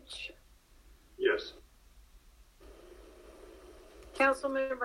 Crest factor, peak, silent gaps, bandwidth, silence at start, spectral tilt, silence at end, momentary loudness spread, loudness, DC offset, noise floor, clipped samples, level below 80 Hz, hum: 22 dB; -16 dBFS; none; 15.5 kHz; 0.1 s; -3.5 dB/octave; 0 s; 26 LU; -32 LUFS; under 0.1%; -61 dBFS; under 0.1%; -60 dBFS; none